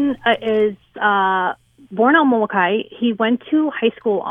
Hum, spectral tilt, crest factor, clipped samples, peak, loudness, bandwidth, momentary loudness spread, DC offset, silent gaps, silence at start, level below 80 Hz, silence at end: none; -7.5 dB/octave; 16 dB; under 0.1%; -2 dBFS; -18 LUFS; 3.8 kHz; 7 LU; under 0.1%; none; 0 s; -60 dBFS; 0 s